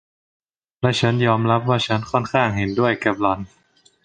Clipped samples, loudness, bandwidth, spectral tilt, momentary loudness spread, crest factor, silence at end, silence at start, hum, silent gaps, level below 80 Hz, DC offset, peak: under 0.1%; -20 LUFS; 9.4 kHz; -6 dB/octave; 5 LU; 20 dB; 0.6 s; 0.8 s; none; none; -50 dBFS; under 0.1%; -2 dBFS